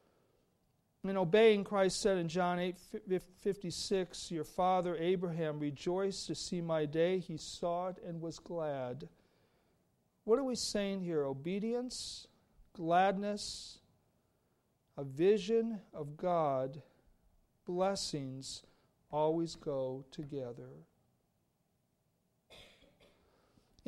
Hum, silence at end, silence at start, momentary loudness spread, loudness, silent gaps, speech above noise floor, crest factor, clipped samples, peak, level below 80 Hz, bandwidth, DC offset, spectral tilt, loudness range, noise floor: none; 1.25 s; 1.05 s; 14 LU; -36 LUFS; none; 44 dB; 20 dB; under 0.1%; -16 dBFS; -68 dBFS; 13 kHz; under 0.1%; -5 dB/octave; 8 LU; -79 dBFS